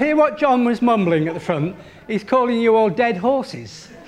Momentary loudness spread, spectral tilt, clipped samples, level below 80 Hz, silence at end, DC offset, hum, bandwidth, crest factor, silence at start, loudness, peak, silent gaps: 13 LU; -7 dB/octave; under 0.1%; -56 dBFS; 0.05 s; under 0.1%; none; 10.5 kHz; 16 dB; 0 s; -18 LUFS; -4 dBFS; none